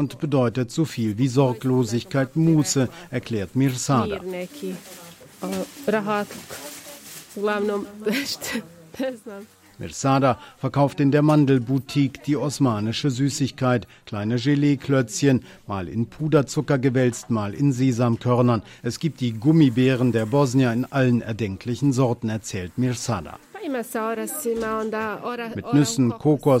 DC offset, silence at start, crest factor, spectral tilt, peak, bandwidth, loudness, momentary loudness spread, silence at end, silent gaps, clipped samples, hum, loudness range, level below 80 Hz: under 0.1%; 0 s; 16 dB; -6 dB/octave; -6 dBFS; 16.5 kHz; -23 LUFS; 13 LU; 0 s; none; under 0.1%; none; 7 LU; -56 dBFS